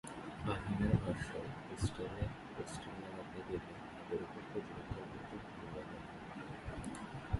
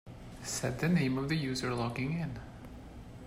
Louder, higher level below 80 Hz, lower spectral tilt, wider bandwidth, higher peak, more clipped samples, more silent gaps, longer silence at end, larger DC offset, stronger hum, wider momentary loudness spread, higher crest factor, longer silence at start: second, -44 LUFS vs -34 LUFS; about the same, -54 dBFS vs -54 dBFS; about the same, -6.5 dB/octave vs -5.5 dB/octave; second, 11.5 kHz vs 16 kHz; about the same, -18 dBFS vs -18 dBFS; neither; neither; about the same, 0 s vs 0 s; neither; neither; second, 11 LU vs 19 LU; first, 24 dB vs 16 dB; about the same, 0.05 s vs 0.05 s